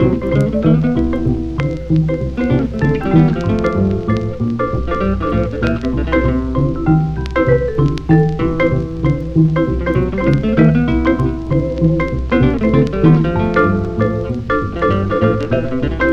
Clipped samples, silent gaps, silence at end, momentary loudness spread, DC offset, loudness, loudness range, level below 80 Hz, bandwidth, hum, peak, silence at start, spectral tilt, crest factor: under 0.1%; none; 0 s; 6 LU; under 0.1%; -15 LUFS; 2 LU; -26 dBFS; 7 kHz; none; 0 dBFS; 0 s; -9 dB/octave; 14 dB